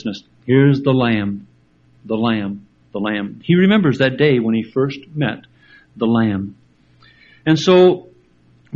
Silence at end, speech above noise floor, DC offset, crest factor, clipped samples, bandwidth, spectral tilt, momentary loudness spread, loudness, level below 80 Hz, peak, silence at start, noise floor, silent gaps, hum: 0 s; 38 dB; under 0.1%; 18 dB; under 0.1%; 7.4 kHz; -7.5 dB/octave; 16 LU; -17 LUFS; -54 dBFS; 0 dBFS; 0.05 s; -53 dBFS; none; none